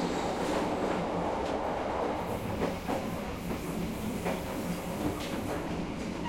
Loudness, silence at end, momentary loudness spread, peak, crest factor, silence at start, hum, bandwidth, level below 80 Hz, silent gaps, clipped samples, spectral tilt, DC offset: -33 LUFS; 0 s; 4 LU; -18 dBFS; 16 dB; 0 s; none; 16.5 kHz; -48 dBFS; none; under 0.1%; -5.5 dB/octave; under 0.1%